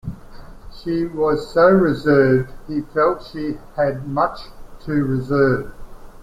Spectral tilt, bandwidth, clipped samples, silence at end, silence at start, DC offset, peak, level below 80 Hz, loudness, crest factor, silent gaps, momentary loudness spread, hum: -8.5 dB/octave; 14 kHz; under 0.1%; 0 s; 0.05 s; under 0.1%; -2 dBFS; -40 dBFS; -19 LUFS; 16 dB; none; 13 LU; none